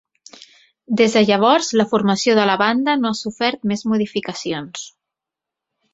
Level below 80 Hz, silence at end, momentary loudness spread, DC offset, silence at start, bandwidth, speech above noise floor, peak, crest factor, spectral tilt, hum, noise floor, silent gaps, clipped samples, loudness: -62 dBFS; 1.05 s; 11 LU; under 0.1%; 0.9 s; 8 kHz; 68 dB; -2 dBFS; 18 dB; -4.5 dB/octave; none; -85 dBFS; none; under 0.1%; -18 LUFS